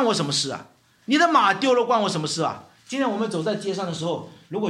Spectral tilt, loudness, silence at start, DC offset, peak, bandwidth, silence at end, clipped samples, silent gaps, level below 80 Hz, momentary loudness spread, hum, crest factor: -4 dB/octave; -22 LUFS; 0 s; under 0.1%; -4 dBFS; 13 kHz; 0 s; under 0.1%; none; -72 dBFS; 14 LU; none; 18 dB